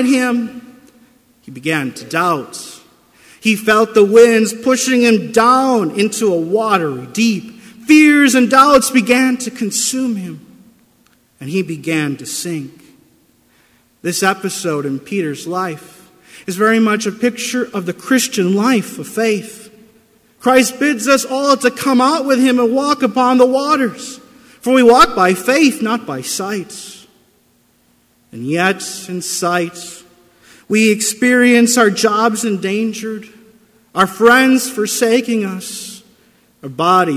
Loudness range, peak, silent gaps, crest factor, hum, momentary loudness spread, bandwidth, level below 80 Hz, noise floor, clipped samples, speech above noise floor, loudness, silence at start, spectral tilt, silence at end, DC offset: 9 LU; 0 dBFS; none; 14 dB; none; 16 LU; 16 kHz; -56 dBFS; -56 dBFS; under 0.1%; 42 dB; -14 LUFS; 0 s; -4 dB/octave; 0 s; under 0.1%